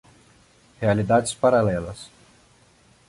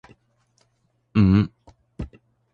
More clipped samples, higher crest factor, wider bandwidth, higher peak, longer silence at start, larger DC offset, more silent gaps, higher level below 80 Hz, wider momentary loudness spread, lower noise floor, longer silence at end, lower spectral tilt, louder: neither; about the same, 18 dB vs 18 dB; first, 11.5 kHz vs 6.8 kHz; about the same, -6 dBFS vs -6 dBFS; second, 0.8 s vs 1.15 s; neither; neither; second, -50 dBFS vs -40 dBFS; about the same, 19 LU vs 20 LU; second, -57 dBFS vs -68 dBFS; first, 1 s vs 0.45 s; second, -6 dB/octave vs -9.5 dB/octave; about the same, -21 LUFS vs -20 LUFS